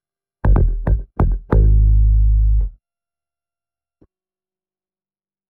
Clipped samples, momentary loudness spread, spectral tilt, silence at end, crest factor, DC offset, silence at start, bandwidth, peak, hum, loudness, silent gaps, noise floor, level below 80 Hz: under 0.1%; 8 LU; -12 dB/octave; 2.8 s; 14 dB; under 0.1%; 0.45 s; 2.1 kHz; -2 dBFS; none; -18 LUFS; none; under -90 dBFS; -18 dBFS